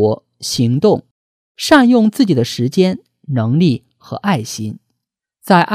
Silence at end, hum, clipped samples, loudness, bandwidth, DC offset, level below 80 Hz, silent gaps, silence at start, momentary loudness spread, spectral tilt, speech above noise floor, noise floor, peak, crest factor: 0 s; none; under 0.1%; -15 LUFS; 15.5 kHz; under 0.1%; -54 dBFS; 1.11-1.55 s; 0 s; 13 LU; -6 dB/octave; 64 dB; -77 dBFS; 0 dBFS; 14 dB